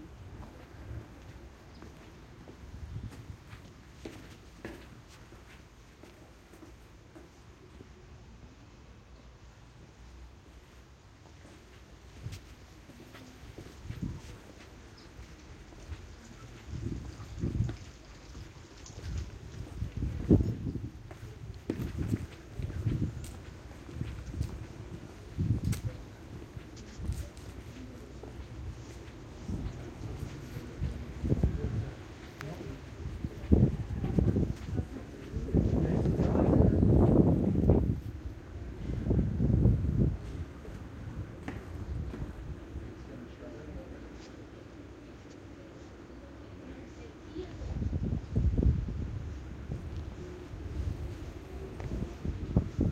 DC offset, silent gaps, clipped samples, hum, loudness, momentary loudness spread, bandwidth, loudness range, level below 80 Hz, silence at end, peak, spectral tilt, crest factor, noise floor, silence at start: under 0.1%; none; under 0.1%; none; -34 LUFS; 25 LU; 14.5 kHz; 23 LU; -40 dBFS; 0 s; -6 dBFS; -8.5 dB/octave; 28 dB; -55 dBFS; 0 s